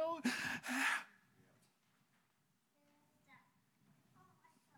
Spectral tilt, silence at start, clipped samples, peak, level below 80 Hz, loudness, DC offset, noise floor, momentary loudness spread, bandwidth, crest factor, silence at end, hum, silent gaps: -2.5 dB/octave; 0 s; under 0.1%; -26 dBFS; -88 dBFS; -39 LUFS; under 0.1%; -81 dBFS; 6 LU; 17.5 kHz; 20 dB; 1.4 s; none; none